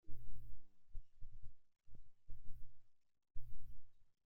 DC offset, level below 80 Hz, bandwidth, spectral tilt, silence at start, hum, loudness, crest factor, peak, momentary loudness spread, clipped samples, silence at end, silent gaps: under 0.1%; -56 dBFS; 0.5 kHz; -8 dB/octave; 0.05 s; none; -64 LUFS; 12 dB; -28 dBFS; 5 LU; under 0.1%; 0.25 s; none